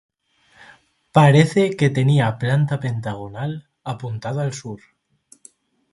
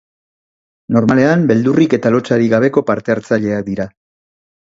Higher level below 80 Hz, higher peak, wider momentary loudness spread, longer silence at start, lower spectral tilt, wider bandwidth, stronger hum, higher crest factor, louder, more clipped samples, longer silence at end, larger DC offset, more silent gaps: about the same, -56 dBFS vs -52 dBFS; about the same, 0 dBFS vs 0 dBFS; first, 18 LU vs 8 LU; first, 1.15 s vs 0.9 s; about the same, -7 dB/octave vs -7.5 dB/octave; first, 11.5 kHz vs 7.8 kHz; neither; first, 20 dB vs 14 dB; second, -19 LUFS vs -14 LUFS; neither; first, 1.15 s vs 0.9 s; neither; neither